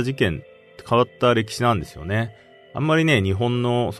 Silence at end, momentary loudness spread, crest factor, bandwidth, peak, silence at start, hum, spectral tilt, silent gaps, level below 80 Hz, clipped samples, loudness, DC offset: 0 s; 9 LU; 16 dB; 13.5 kHz; -4 dBFS; 0 s; none; -6 dB/octave; none; -48 dBFS; under 0.1%; -21 LUFS; under 0.1%